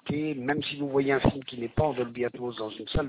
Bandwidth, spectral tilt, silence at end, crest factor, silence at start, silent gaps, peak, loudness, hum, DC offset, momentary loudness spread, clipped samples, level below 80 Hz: 4 kHz; -10.5 dB/octave; 0 s; 20 dB; 0.05 s; none; -10 dBFS; -29 LUFS; none; under 0.1%; 9 LU; under 0.1%; -44 dBFS